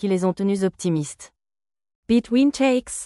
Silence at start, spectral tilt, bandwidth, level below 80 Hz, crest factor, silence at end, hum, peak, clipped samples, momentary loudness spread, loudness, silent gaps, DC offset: 0 s; -5.5 dB/octave; 12 kHz; -56 dBFS; 14 dB; 0 s; none; -8 dBFS; under 0.1%; 8 LU; -21 LUFS; 1.95-2.03 s; under 0.1%